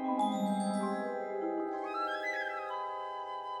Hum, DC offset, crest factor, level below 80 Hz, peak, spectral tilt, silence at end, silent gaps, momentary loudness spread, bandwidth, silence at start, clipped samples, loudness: none; under 0.1%; 14 dB; -86 dBFS; -20 dBFS; -5.5 dB/octave; 0 s; none; 7 LU; 12 kHz; 0 s; under 0.1%; -35 LUFS